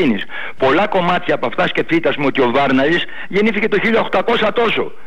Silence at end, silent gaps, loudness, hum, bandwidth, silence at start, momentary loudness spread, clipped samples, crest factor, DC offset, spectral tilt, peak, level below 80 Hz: 0.2 s; none; -16 LUFS; none; 11 kHz; 0 s; 5 LU; under 0.1%; 10 dB; 6%; -6.5 dB/octave; -6 dBFS; -50 dBFS